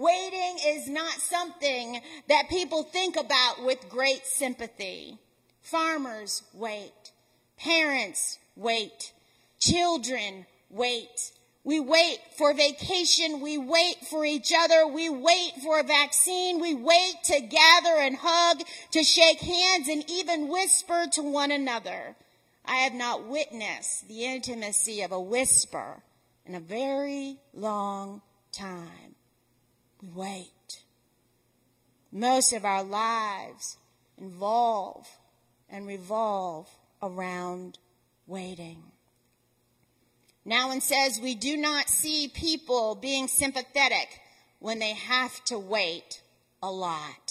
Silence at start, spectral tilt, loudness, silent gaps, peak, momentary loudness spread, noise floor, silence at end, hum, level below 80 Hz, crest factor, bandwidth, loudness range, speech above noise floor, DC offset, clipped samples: 0 s; -1 dB/octave; -25 LUFS; none; -4 dBFS; 19 LU; -70 dBFS; 0.15 s; none; -60 dBFS; 24 dB; 16 kHz; 14 LU; 43 dB; under 0.1%; under 0.1%